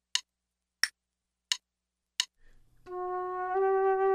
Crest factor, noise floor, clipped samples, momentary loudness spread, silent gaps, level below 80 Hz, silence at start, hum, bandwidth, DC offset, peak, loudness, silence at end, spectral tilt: 24 dB; -87 dBFS; under 0.1%; 10 LU; none; -68 dBFS; 0.15 s; 60 Hz at -80 dBFS; 15.5 kHz; under 0.1%; -10 dBFS; -32 LUFS; 0 s; -0.5 dB/octave